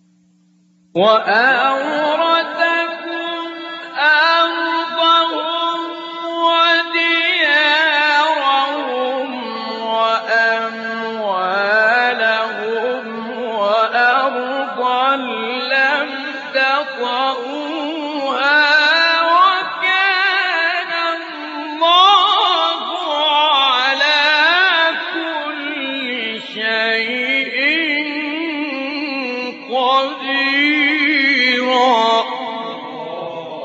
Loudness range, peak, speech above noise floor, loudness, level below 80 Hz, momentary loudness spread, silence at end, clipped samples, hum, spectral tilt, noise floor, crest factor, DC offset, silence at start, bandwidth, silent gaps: 4 LU; 0 dBFS; 41 dB; -15 LUFS; -76 dBFS; 12 LU; 0 s; under 0.1%; none; 1.5 dB/octave; -55 dBFS; 16 dB; under 0.1%; 0.95 s; 8 kHz; none